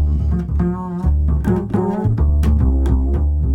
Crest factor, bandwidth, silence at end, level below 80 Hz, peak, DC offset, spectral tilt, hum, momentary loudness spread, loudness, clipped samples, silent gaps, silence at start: 12 dB; 3.5 kHz; 0 s; -18 dBFS; -2 dBFS; under 0.1%; -10 dB/octave; none; 4 LU; -18 LUFS; under 0.1%; none; 0 s